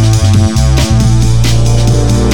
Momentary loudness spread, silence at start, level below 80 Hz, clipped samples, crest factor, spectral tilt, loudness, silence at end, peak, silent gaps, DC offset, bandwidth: 1 LU; 0 s; -14 dBFS; under 0.1%; 8 dB; -5.5 dB/octave; -9 LUFS; 0 s; 0 dBFS; none; under 0.1%; 16.5 kHz